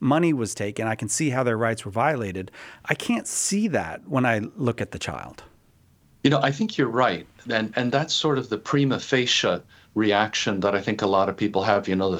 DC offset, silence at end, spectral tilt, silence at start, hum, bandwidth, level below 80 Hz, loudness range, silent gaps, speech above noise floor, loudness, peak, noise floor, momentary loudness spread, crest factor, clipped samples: under 0.1%; 0 s; -4.5 dB/octave; 0 s; none; 16.5 kHz; -60 dBFS; 3 LU; none; 35 dB; -24 LUFS; -2 dBFS; -58 dBFS; 9 LU; 22 dB; under 0.1%